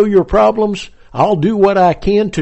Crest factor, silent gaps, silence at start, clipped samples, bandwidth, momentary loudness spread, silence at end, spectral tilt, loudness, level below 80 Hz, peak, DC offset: 10 dB; none; 0 s; under 0.1%; 8.4 kHz; 8 LU; 0 s; -7 dB/octave; -13 LUFS; -32 dBFS; -2 dBFS; under 0.1%